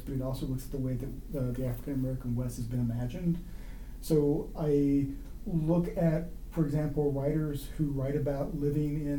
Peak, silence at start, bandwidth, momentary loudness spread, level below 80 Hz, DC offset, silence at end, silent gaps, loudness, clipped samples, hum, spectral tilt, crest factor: -16 dBFS; 0 s; 19 kHz; 9 LU; -42 dBFS; under 0.1%; 0 s; none; -32 LUFS; under 0.1%; none; -8.5 dB/octave; 16 dB